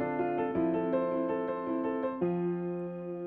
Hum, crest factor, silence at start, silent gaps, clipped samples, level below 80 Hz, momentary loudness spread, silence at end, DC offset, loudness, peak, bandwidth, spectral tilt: none; 14 dB; 0 s; none; under 0.1%; -66 dBFS; 5 LU; 0 s; under 0.1%; -32 LUFS; -18 dBFS; 4 kHz; -11 dB/octave